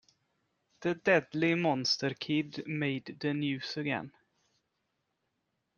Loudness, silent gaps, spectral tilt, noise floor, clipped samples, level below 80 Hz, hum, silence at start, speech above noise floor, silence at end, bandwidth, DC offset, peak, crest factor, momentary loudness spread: -32 LUFS; none; -5 dB/octave; -82 dBFS; under 0.1%; -76 dBFS; none; 0.8 s; 50 dB; 1.7 s; 7.2 kHz; under 0.1%; -12 dBFS; 22 dB; 9 LU